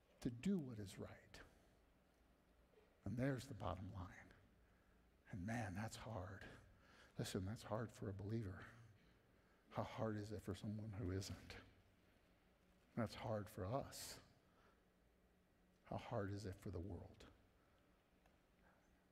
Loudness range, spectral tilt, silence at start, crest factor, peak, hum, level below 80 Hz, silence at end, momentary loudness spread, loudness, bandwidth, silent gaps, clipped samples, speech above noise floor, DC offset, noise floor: 4 LU; -6 dB/octave; 0.1 s; 22 dB; -30 dBFS; none; -72 dBFS; 0.4 s; 17 LU; -50 LUFS; 15.5 kHz; none; under 0.1%; 28 dB; under 0.1%; -77 dBFS